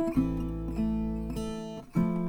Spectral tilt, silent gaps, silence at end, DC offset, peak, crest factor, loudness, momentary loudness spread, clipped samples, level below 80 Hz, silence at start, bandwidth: -8 dB/octave; none; 0 s; under 0.1%; -14 dBFS; 16 dB; -32 LUFS; 6 LU; under 0.1%; -40 dBFS; 0 s; 19 kHz